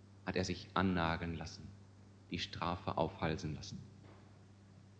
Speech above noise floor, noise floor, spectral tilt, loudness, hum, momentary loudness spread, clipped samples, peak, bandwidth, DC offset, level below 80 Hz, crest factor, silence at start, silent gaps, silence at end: 21 dB; -60 dBFS; -5.5 dB/octave; -39 LUFS; none; 23 LU; under 0.1%; -16 dBFS; 9 kHz; under 0.1%; -60 dBFS; 24 dB; 0 s; none; 0 s